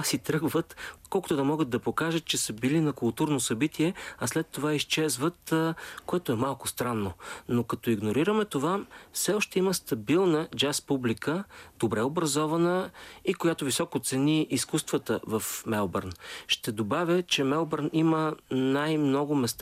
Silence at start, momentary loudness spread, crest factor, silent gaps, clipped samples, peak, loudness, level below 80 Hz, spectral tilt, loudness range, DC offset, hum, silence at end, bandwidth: 0 s; 7 LU; 16 dB; none; under 0.1%; -12 dBFS; -28 LUFS; -64 dBFS; -4.5 dB/octave; 2 LU; under 0.1%; none; 0 s; 15.5 kHz